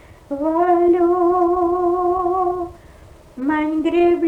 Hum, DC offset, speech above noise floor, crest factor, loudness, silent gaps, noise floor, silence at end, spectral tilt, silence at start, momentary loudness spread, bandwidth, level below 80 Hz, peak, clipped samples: none; under 0.1%; 28 dB; 12 dB; -18 LUFS; none; -44 dBFS; 0 s; -7.5 dB/octave; 0.1 s; 10 LU; 4.2 kHz; -46 dBFS; -6 dBFS; under 0.1%